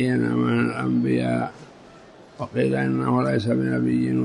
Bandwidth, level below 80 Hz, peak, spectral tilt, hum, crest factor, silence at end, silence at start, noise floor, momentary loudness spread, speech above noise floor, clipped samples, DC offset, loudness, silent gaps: 10.5 kHz; -58 dBFS; -10 dBFS; -8 dB/octave; none; 12 dB; 0 s; 0 s; -47 dBFS; 5 LU; 25 dB; under 0.1%; under 0.1%; -23 LUFS; none